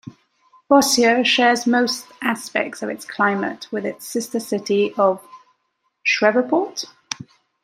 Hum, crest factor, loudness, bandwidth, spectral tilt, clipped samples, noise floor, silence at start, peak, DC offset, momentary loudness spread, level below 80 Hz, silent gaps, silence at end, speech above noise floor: none; 20 dB; -19 LUFS; 16 kHz; -3 dB/octave; under 0.1%; -71 dBFS; 0.05 s; -2 dBFS; under 0.1%; 14 LU; -66 dBFS; none; 0.4 s; 52 dB